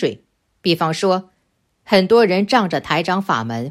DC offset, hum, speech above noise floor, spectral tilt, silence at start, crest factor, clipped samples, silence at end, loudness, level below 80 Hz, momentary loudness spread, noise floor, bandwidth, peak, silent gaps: under 0.1%; none; 50 dB; -5.5 dB/octave; 0 s; 18 dB; under 0.1%; 0 s; -17 LUFS; -58 dBFS; 8 LU; -66 dBFS; 15.5 kHz; 0 dBFS; none